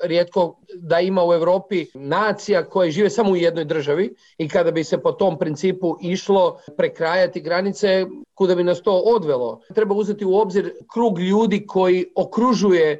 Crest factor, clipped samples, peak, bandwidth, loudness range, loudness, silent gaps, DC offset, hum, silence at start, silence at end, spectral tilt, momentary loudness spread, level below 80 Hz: 10 dB; under 0.1%; -8 dBFS; 8 kHz; 1 LU; -20 LUFS; none; under 0.1%; none; 0 s; 0 s; -6 dB/octave; 6 LU; -62 dBFS